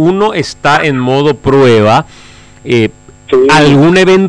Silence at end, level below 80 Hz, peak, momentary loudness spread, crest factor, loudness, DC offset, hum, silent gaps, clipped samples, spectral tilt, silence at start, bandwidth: 0 s; -38 dBFS; -2 dBFS; 8 LU; 8 dB; -8 LUFS; under 0.1%; none; none; under 0.1%; -6 dB/octave; 0 s; 11 kHz